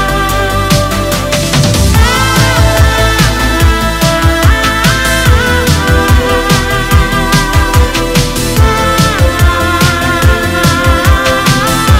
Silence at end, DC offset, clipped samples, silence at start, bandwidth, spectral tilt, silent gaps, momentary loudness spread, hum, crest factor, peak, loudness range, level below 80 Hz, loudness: 0 s; under 0.1%; 0.3%; 0 s; 16.5 kHz; -4.5 dB/octave; none; 3 LU; none; 8 dB; 0 dBFS; 1 LU; -14 dBFS; -9 LUFS